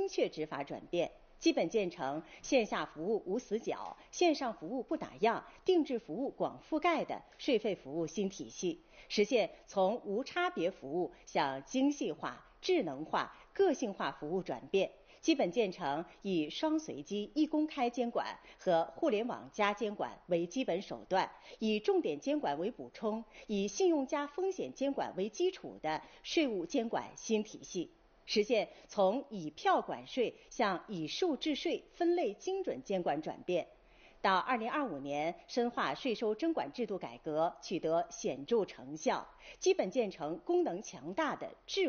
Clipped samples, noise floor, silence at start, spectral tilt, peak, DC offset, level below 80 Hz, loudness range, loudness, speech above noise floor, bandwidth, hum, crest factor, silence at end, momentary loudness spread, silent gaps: under 0.1%; -62 dBFS; 0 s; -3.5 dB/octave; -16 dBFS; under 0.1%; -68 dBFS; 1 LU; -36 LUFS; 27 dB; 6.8 kHz; none; 18 dB; 0 s; 8 LU; none